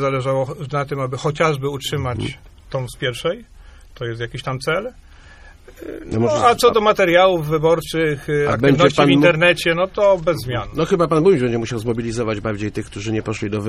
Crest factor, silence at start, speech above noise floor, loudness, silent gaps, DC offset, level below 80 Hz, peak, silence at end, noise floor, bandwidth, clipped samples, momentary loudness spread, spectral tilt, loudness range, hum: 18 dB; 0 s; 25 dB; -18 LUFS; none; under 0.1%; -42 dBFS; 0 dBFS; 0 s; -43 dBFS; 15 kHz; under 0.1%; 14 LU; -5.5 dB/octave; 11 LU; none